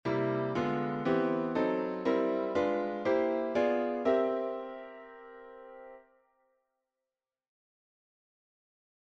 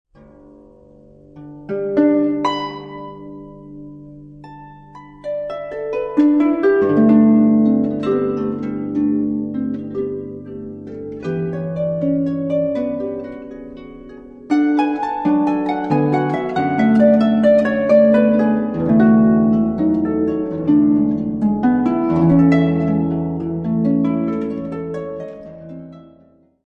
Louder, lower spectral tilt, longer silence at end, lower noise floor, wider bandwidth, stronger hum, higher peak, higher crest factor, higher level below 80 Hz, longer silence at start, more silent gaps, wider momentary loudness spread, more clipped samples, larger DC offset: second, -31 LUFS vs -17 LUFS; second, -7.5 dB/octave vs -9.5 dB/octave; first, 3.05 s vs 0.75 s; first, under -90 dBFS vs -52 dBFS; first, 7.6 kHz vs 5.8 kHz; neither; second, -16 dBFS vs -2 dBFS; about the same, 18 dB vs 16 dB; second, -70 dBFS vs -48 dBFS; second, 0.05 s vs 1.35 s; neither; about the same, 20 LU vs 21 LU; neither; neither